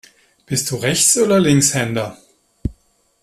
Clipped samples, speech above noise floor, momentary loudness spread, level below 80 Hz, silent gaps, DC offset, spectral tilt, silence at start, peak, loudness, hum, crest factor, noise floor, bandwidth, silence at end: under 0.1%; 41 dB; 17 LU; -42 dBFS; none; under 0.1%; -3.5 dB/octave; 0.5 s; 0 dBFS; -15 LUFS; none; 18 dB; -57 dBFS; 15 kHz; 0.5 s